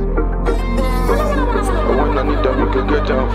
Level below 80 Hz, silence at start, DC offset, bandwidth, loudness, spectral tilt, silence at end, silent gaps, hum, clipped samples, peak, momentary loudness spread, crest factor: -18 dBFS; 0 s; 0.4%; 13 kHz; -17 LUFS; -7 dB/octave; 0 s; none; none; under 0.1%; -2 dBFS; 3 LU; 14 dB